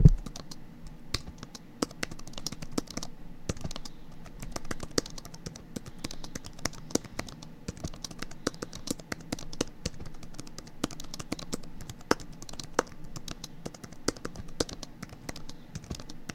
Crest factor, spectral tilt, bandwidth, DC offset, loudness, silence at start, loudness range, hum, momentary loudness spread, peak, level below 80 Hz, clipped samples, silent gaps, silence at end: 30 dB; -4.5 dB/octave; 16.5 kHz; under 0.1%; -37 LUFS; 0 s; 3 LU; none; 13 LU; -4 dBFS; -40 dBFS; under 0.1%; none; 0 s